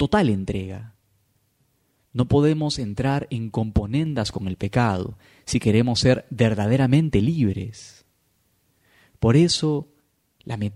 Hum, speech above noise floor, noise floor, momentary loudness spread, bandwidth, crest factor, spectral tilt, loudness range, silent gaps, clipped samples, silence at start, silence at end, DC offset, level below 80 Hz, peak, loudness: none; 46 dB; -67 dBFS; 13 LU; 12 kHz; 18 dB; -6.5 dB/octave; 4 LU; none; under 0.1%; 0 s; 0 s; under 0.1%; -42 dBFS; -4 dBFS; -22 LUFS